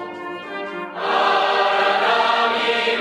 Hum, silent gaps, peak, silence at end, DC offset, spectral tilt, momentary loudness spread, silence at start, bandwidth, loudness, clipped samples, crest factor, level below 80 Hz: none; none; -4 dBFS; 0 s; under 0.1%; -2.5 dB/octave; 13 LU; 0 s; 13.5 kHz; -18 LUFS; under 0.1%; 14 dB; -72 dBFS